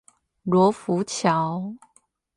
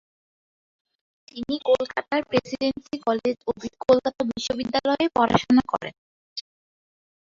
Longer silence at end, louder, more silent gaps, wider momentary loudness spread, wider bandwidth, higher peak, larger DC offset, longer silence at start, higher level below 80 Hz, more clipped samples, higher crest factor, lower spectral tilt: second, 0.6 s vs 0.85 s; about the same, -23 LUFS vs -24 LUFS; second, none vs 5.98-6.36 s; second, 14 LU vs 17 LU; first, 11.5 kHz vs 7.6 kHz; second, -6 dBFS vs -2 dBFS; neither; second, 0.45 s vs 1.35 s; second, -66 dBFS vs -56 dBFS; neither; about the same, 18 dB vs 22 dB; about the same, -6 dB/octave vs -5 dB/octave